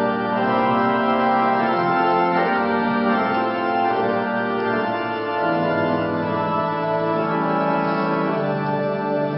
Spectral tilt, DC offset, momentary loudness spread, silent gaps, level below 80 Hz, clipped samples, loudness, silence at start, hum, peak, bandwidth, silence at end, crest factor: -11.5 dB/octave; under 0.1%; 4 LU; none; -60 dBFS; under 0.1%; -20 LUFS; 0 s; none; -6 dBFS; 5.8 kHz; 0 s; 14 dB